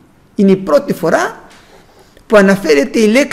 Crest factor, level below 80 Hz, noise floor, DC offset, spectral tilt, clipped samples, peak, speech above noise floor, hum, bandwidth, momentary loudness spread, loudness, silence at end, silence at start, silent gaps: 12 dB; -44 dBFS; -44 dBFS; under 0.1%; -5.5 dB/octave; under 0.1%; 0 dBFS; 33 dB; none; 16 kHz; 6 LU; -11 LUFS; 0 s; 0.4 s; none